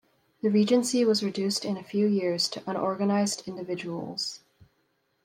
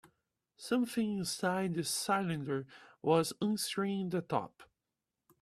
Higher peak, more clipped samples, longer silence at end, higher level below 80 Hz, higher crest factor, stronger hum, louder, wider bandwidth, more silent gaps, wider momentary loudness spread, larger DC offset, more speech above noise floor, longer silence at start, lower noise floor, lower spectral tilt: first, -10 dBFS vs -16 dBFS; neither; first, 0.9 s vs 0.75 s; about the same, -74 dBFS vs -74 dBFS; about the same, 18 dB vs 20 dB; neither; first, -27 LUFS vs -34 LUFS; about the same, 15.5 kHz vs 15 kHz; neither; first, 11 LU vs 8 LU; neither; second, 46 dB vs 55 dB; second, 0.45 s vs 0.6 s; second, -72 dBFS vs -89 dBFS; about the same, -4.5 dB/octave vs -4.5 dB/octave